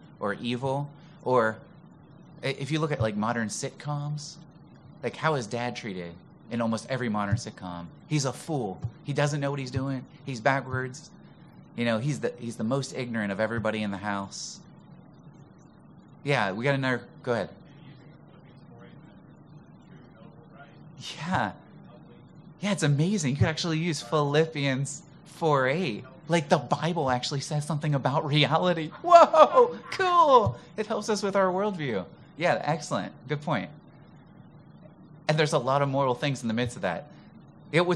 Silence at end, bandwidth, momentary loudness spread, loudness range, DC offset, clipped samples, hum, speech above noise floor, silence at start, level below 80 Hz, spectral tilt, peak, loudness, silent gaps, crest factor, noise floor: 0 s; 12 kHz; 14 LU; 12 LU; under 0.1%; under 0.1%; none; 26 dB; 0.05 s; -62 dBFS; -5.5 dB/octave; -4 dBFS; -27 LUFS; none; 24 dB; -52 dBFS